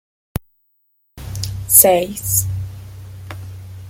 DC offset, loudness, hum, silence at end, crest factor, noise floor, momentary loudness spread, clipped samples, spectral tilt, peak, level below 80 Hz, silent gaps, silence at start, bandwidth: under 0.1%; -14 LUFS; none; 0 s; 20 dB; -64 dBFS; 26 LU; under 0.1%; -3.5 dB/octave; 0 dBFS; -40 dBFS; none; 0.35 s; 16.5 kHz